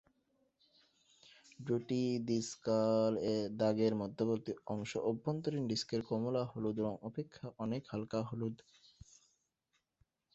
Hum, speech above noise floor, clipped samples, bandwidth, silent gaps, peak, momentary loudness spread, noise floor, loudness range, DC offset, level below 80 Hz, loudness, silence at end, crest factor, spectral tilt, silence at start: none; 47 dB; under 0.1%; 8 kHz; none; -20 dBFS; 10 LU; -83 dBFS; 7 LU; under 0.1%; -72 dBFS; -37 LUFS; 1.8 s; 18 dB; -6.5 dB/octave; 1.6 s